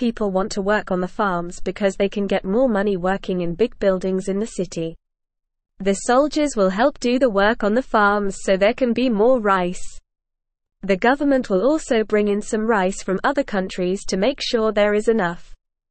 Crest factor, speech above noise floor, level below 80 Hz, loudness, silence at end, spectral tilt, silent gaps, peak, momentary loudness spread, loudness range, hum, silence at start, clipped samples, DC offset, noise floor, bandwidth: 16 dB; 60 dB; -42 dBFS; -20 LUFS; 0.35 s; -5 dB/octave; none; -4 dBFS; 7 LU; 4 LU; none; 0 s; under 0.1%; 0.4%; -80 dBFS; 8.8 kHz